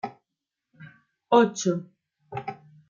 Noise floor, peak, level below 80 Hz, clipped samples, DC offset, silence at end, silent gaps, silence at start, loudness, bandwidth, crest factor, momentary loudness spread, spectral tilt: -86 dBFS; -6 dBFS; -74 dBFS; under 0.1%; under 0.1%; 0.35 s; none; 0.05 s; -25 LUFS; 7.6 kHz; 22 dB; 19 LU; -5 dB/octave